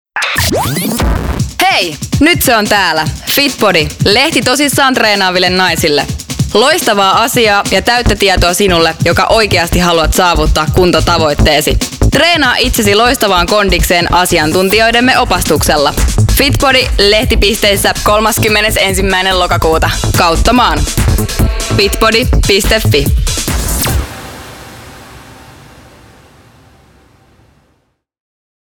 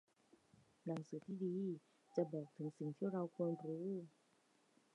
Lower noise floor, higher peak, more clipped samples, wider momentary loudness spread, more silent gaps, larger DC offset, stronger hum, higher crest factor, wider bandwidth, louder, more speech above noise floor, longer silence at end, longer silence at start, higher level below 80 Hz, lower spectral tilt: second, -59 dBFS vs -77 dBFS; first, 0 dBFS vs -26 dBFS; neither; about the same, 6 LU vs 7 LU; neither; first, 0.4% vs under 0.1%; neither; second, 10 dB vs 20 dB; first, over 20 kHz vs 10.5 kHz; first, -9 LUFS vs -46 LUFS; first, 50 dB vs 32 dB; first, 3.35 s vs 0.85 s; second, 0.15 s vs 0.85 s; first, -20 dBFS vs under -90 dBFS; second, -3.5 dB/octave vs -9 dB/octave